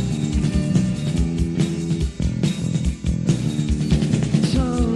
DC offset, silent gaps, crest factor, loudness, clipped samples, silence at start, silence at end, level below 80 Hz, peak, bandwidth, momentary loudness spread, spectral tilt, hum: under 0.1%; none; 16 dB; -21 LUFS; under 0.1%; 0 s; 0 s; -28 dBFS; -4 dBFS; 12 kHz; 4 LU; -6.5 dB/octave; none